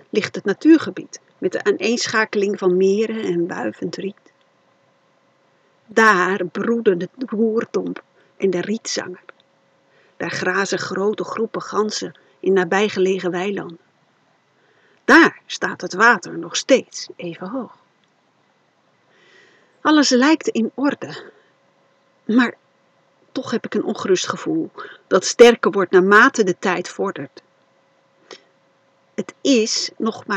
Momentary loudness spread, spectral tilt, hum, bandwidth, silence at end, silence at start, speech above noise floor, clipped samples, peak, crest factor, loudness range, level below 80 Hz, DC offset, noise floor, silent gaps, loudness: 18 LU; -4 dB/octave; none; 11 kHz; 0 s; 0.15 s; 43 dB; under 0.1%; 0 dBFS; 20 dB; 9 LU; -70 dBFS; under 0.1%; -61 dBFS; none; -18 LUFS